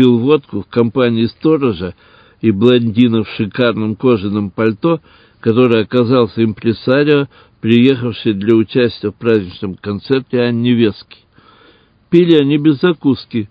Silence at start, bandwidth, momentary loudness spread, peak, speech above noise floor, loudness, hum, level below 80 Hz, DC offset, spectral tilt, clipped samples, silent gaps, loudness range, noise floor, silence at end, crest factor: 0 s; 5.2 kHz; 9 LU; 0 dBFS; 36 dB; -14 LUFS; none; -46 dBFS; under 0.1%; -9.5 dB/octave; under 0.1%; none; 2 LU; -49 dBFS; 0.05 s; 14 dB